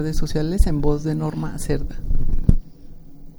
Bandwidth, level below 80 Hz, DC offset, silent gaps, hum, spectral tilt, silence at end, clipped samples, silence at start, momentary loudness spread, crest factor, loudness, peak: 12 kHz; -22 dBFS; under 0.1%; none; none; -7 dB/octave; 0.1 s; under 0.1%; 0 s; 7 LU; 18 dB; -24 LUFS; 0 dBFS